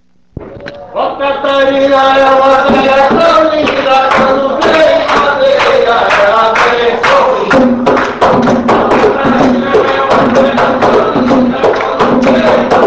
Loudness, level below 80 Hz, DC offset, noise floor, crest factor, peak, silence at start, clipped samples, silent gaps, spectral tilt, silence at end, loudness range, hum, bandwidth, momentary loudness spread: -8 LUFS; -36 dBFS; 0.5%; -29 dBFS; 8 dB; 0 dBFS; 0.4 s; 1%; none; -5 dB/octave; 0 s; 1 LU; none; 8 kHz; 4 LU